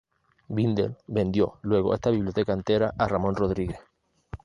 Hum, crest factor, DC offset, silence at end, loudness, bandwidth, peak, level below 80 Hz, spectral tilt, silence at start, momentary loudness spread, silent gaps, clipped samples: none; 18 dB; under 0.1%; 0.1 s; -26 LUFS; 10 kHz; -8 dBFS; -46 dBFS; -8 dB/octave; 0.5 s; 8 LU; none; under 0.1%